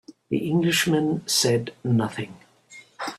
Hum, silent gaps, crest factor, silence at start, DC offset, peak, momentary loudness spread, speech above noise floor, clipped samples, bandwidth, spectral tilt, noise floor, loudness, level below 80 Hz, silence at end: none; none; 16 dB; 0.1 s; under 0.1%; -8 dBFS; 13 LU; 27 dB; under 0.1%; 15.5 kHz; -4 dB/octave; -50 dBFS; -23 LUFS; -62 dBFS; 0 s